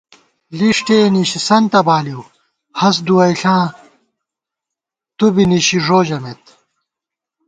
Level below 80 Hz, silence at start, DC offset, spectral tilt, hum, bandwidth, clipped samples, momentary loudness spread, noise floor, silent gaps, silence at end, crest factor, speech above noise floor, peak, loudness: -54 dBFS; 0.5 s; under 0.1%; -5 dB/octave; none; 9.4 kHz; under 0.1%; 14 LU; -84 dBFS; none; 1.15 s; 16 dB; 71 dB; 0 dBFS; -13 LUFS